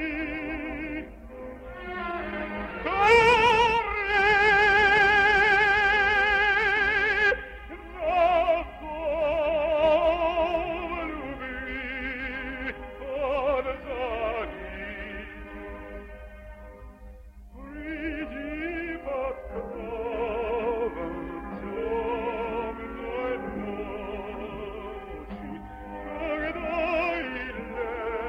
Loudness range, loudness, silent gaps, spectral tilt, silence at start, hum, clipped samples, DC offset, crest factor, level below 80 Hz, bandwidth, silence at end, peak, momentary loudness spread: 15 LU; -25 LUFS; none; -4.5 dB/octave; 0 s; none; under 0.1%; under 0.1%; 20 dB; -44 dBFS; 13.5 kHz; 0 s; -8 dBFS; 20 LU